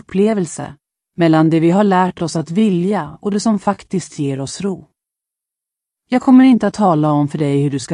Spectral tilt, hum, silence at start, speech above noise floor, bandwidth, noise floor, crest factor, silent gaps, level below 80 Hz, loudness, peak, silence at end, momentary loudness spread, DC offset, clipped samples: -7 dB/octave; none; 0.1 s; 70 dB; 11 kHz; -85 dBFS; 14 dB; none; -56 dBFS; -15 LUFS; 0 dBFS; 0 s; 12 LU; under 0.1%; under 0.1%